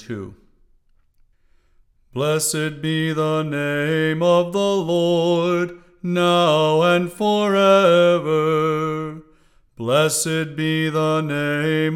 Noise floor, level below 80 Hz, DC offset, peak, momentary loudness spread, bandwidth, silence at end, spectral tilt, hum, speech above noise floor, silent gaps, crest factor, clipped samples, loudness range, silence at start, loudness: -57 dBFS; -58 dBFS; under 0.1%; -2 dBFS; 10 LU; 17 kHz; 0 s; -5 dB/octave; none; 39 dB; none; 16 dB; under 0.1%; 7 LU; 0 s; -19 LUFS